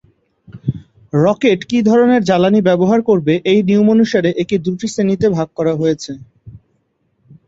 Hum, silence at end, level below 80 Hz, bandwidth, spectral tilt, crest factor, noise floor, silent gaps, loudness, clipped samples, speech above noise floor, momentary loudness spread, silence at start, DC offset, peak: none; 0.9 s; -50 dBFS; 7.8 kHz; -7 dB/octave; 14 dB; -63 dBFS; none; -14 LUFS; under 0.1%; 50 dB; 13 LU; 0.5 s; under 0.1%; -2 dBFS